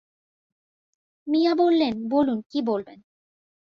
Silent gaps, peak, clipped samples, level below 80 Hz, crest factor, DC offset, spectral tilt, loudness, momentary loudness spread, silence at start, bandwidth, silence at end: 2.46-2.50 s; -10 dBFS; under 0.1%; -66 dBFS; 16 dB; under 0.1%; -7 dB/octave; -23 LUFS; 8 LU; 1.25 s; 6.4 kHz; 0.85 s